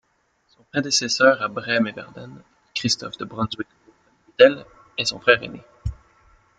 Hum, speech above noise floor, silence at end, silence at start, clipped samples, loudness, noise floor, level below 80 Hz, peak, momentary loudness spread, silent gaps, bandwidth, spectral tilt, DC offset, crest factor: none; 45 dB; 0.65 s; 0.75 s; under 0.1%; -20 LUFS; -66 dBFS; -48 dBFS; -2 dBFS; 21 LU; none; 9.4 kHz; -3 dB/octave; under 0.1%; 22 dB